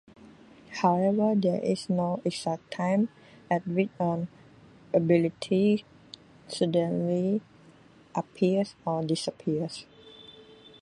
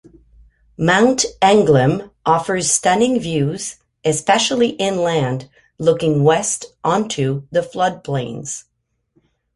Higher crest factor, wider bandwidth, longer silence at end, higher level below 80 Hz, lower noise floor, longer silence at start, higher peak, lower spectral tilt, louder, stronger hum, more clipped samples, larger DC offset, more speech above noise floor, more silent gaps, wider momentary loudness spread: about the same, 18 dB vs 16 dB; about the same, 11.5 kHz vs 11.5 kHz; second, 0.4 s vs 0.95 s; second, -68 dBFS vs -52 dBFS; second, -55 dBFS vs -64 dBFS; second, 0.25 s vs 0.8 s; second, -10 dBFS vs -2 dBFS; first, -7 dB/octave vs -4.5 dB/octave; second, -28 LUFS vs -17 LUFS; neither; neither; neither; second, 29 dB vs 47 dB; neither; first, 17 LU vs 10 LU